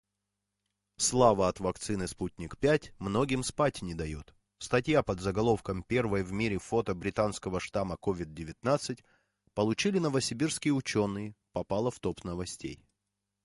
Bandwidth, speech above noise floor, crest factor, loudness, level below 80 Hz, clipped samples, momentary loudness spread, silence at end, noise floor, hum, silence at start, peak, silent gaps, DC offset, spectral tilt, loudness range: 11.5 kHz; 55 dB; 22 dB; -31 LUFS; -52 dBFS; under 0.1%; 11 LU; 0.7 s; -85 dBFS; none; 1 s; -10 dBFS; none; under 0.1%; -5 dB/octave; 3 LU